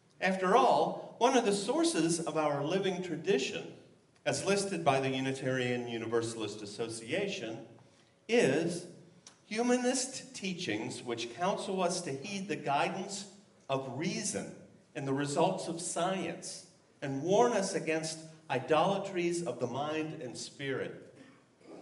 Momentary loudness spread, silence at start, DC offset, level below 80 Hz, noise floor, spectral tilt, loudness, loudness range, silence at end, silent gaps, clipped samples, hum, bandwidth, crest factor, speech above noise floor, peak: 13 LU; 0.2 s; under 0.1%; -80 dBFS; -63 dBFS; -4 dB/octave; -33 LUFS; 4 LU; 0 s; none; under 0.1%; none; 11.5 kHz; 20 dB; 30 dB; -14 dBFS